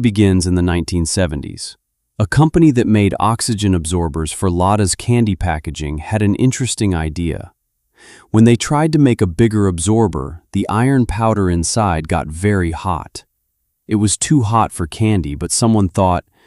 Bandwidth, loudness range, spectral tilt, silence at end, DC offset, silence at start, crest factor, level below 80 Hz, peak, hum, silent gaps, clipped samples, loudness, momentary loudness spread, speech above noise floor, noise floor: 14 kHz; 3 LU; -5.5 dB/octave; 0.25 s; under 0.1%; 0 s; 14 dB; -32 dBFS; -2 dBFS; none; none; under 0.1%; -16 LUFS; 9 LU; 54 dB; -69 dBFS